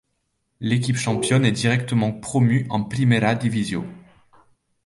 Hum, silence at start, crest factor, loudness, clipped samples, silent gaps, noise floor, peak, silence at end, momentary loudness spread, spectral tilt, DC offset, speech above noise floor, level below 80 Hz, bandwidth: none; 0.6 s; 18 dB; -21 LUFS; under 0.1%; none; -73 dBFS; -4 dBFS; 0.85 s; 8 LU; -6 dB/octave; under 0.1%; 53 dB; -54 dBFS; 11.5 kHz